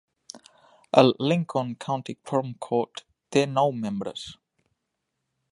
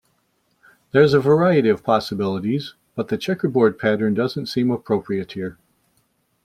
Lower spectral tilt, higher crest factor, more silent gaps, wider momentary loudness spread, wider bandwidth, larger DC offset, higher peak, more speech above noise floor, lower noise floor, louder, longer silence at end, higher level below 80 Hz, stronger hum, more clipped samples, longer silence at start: second, -6 dB/octave vs -7.5 dB/octave; first, 26 dB vs 18 dB; neither; first, 23 LU vs 12 LU; second, 11.5 kHz vs 14 kHz; neither; about the same, -2 dBFS vs -2 dBFS; first, 56 dB vs 47 dB; first, -81 dBFS vs -66 dBFS; second, -25 LUFS vs -20 LUFS; first, 1.2 s vs 0.95 s; second, -68 dBFS vs -58 dBFS; neither; neither; second, 0.35 s vs 0.95 s